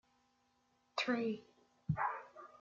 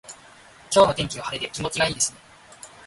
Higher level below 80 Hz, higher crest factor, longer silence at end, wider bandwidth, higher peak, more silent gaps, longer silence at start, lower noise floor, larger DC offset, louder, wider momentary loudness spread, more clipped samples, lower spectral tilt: second, -70 dBFS vs -52 dBFS; about the same, 20 dB vs 20 dB; about the same, 0.15 s vs 0.2 s; second, 7.4 kHz vs 11.5 kHz; second, -22 dBFS vs -4 dBFS; neither; first, 0.95 s vs 0.1 s; first, -77 dBFS vs -49 dBFS; neither; second, -40 LUFS vs -22 LUFS; second, 13 LU vs 25 LU; neither; first, -4 dB/octave vs -2.5 dB/octave